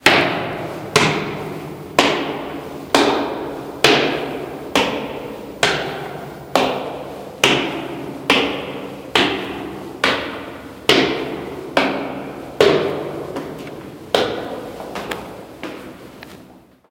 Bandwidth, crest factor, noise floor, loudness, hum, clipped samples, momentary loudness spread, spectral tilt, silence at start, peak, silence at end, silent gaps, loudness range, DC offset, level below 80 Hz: 16.5 kHz; 20 dB; -45 dBFS; -19 LUFS; none; under 0.1%; 16 LU; -3.5 dB/octave; 0 s; 0 dBFS; 0.3 s; none; 3 LU; under 0.1%; -50 dBFS